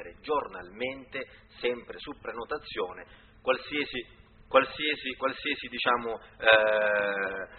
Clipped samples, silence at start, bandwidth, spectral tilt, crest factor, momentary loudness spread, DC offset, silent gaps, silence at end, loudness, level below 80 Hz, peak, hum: under 0.1%; 0 s; 4.5 kHz; 0 dB/octave; 26 dB; 16 LU; under 0.1%; none; 0 s; -29 LUFS; -60 dBFS; -4 dBFS; none